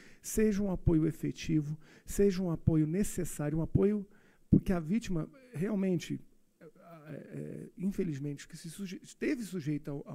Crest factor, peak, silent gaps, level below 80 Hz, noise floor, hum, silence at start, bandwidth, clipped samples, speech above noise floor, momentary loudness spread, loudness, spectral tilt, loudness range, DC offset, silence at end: 22 dB; -12 dBFS; none; -48 dBFS; -58 dBFS; none; 0 s; 16 kHz; under 0.1%; 26 dB; 14 LU; -33 LUFS; -7 dB/octave; 8 LU; under 0.1%; 0 s